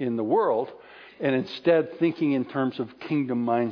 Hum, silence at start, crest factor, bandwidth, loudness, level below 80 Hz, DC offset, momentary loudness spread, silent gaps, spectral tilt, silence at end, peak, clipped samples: none; 0 s; 16 dB; 5.4 kHz; -25 LUFS; -72 dBFS; under 0.1%; 7 LU; none; -8.5 dB/octave; 0 s; -8 dBFS; under 0.1%